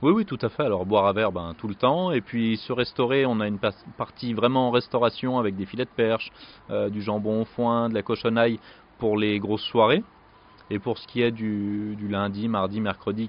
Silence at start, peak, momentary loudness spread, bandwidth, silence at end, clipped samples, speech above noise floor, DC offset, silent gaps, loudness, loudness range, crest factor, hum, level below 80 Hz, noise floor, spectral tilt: 0 s; -6 dBFS; 9 LU; 5.4 kHz; 0 s; under 0.1%; 28 dB; under 0.1%; none; -25 LUFS; 2 LU; 18 dB; none; -58 dBFS; -53 dBFS; -4.5 dB/octave